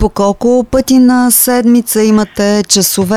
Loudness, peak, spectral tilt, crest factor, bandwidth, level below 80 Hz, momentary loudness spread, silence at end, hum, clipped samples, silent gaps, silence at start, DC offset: -9 LUFS; 0 dBFS; -4 dB/octave; 10 dB; 17.5 kHz; -30 dBFS; 5 LU; 0 s; none; under 0.1%; none; 0 s; 0.6%